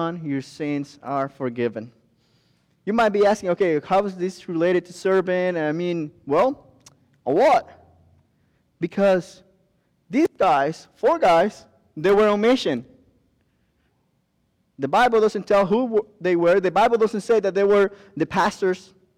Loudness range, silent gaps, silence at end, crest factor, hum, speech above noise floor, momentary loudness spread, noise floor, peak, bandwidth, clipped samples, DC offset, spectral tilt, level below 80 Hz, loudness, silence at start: 4 LU; none; 0.4 s; 12 dB; none; 48 dB; 11 LU; -68 dBFS; -10 dBFS; 12.5 kHz; under 0.1%; under 0.1%; -6 dB/octave; -58 dBFS; -21 LUFS; 0 s